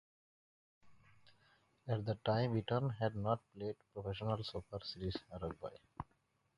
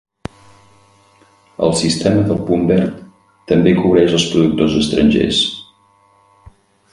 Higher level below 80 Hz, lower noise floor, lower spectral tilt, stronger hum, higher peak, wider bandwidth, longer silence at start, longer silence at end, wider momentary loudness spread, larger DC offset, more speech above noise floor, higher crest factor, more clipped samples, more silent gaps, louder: second, -62 dBFS vs -40 dBFS; first, -73 dBFS vs -53 dBFS; first, -8 dB/octave vs -5.5 dB/octave; neither; second, -20 dBFS vs 0 dBFS; about the same, 10.5 kHz vs 11.5 kHz; second, 0.85 s vs 1.6 s; second, 0.55 s vs 1.3 s; about the same, 15 LU vs 17 LU; neither; second, 33 dB vs 40 dB; first, 22 dB vs 16 dB; neither; neither; second, -41 LUFS vs -14 LUFS